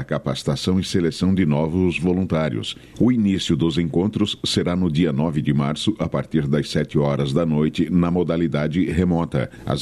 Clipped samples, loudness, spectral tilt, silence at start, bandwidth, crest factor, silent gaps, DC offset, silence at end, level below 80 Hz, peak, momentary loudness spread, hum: under 0.1%; -21 LUFS; -6.5 dB/octave; 0 s; 12.5 kHz; 14 dB; none; under 0.1%; 0 s; -42 dBFS; -6 dBFS; 4 LU; none